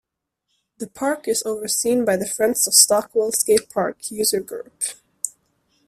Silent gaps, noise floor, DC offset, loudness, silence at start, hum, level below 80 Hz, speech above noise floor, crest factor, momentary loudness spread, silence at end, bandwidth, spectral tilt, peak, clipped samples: none; -77 dBFS; under 0.1%; -19 LUFS; 0.8 s; none; -62 dBFS; 56 dB; 22 dB; 16 LU; 0.6 s; 16 kHz; -1.5 dB/octave; 0 dBFS; under 0.1%